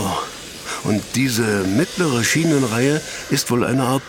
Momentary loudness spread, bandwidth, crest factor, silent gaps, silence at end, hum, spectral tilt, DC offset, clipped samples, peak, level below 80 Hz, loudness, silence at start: 9 LU; 19 kHz; 16 dB; none; 0 s; none; -4.5 dB/octave; under 0.1%; under 0.1%; -4 dBFS; -50 dBFS; -19 LUFS; 0 s